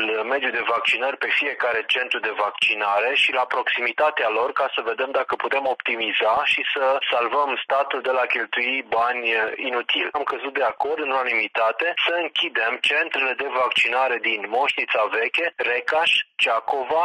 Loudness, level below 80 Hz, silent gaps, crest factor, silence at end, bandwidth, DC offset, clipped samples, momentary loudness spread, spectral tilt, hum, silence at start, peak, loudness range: -21 LUFS; -70 dBFS; none; 12 dB; 0 s; 12 kHz; under 0.1%; under 0.1%; 5 LU; -1.5 dB/octave; none; 0 s; -10 dBFS; 2 LU